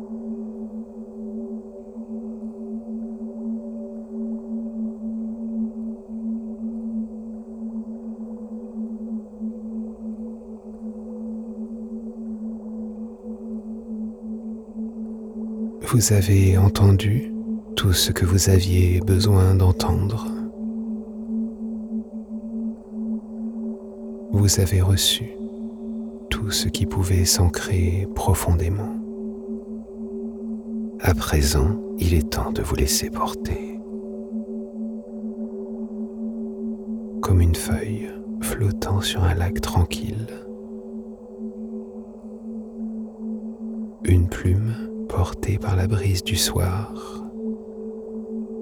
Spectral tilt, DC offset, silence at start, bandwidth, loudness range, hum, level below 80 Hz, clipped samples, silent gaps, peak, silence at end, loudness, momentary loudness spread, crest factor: -5 dB/octave; under 0.1%; 0 s; 18 kHz; 14 LU; none; -36 dBFS; under 0.1%; none; -4 dBFS; 0 s; -24 LUFS; 16 LU; 18 dB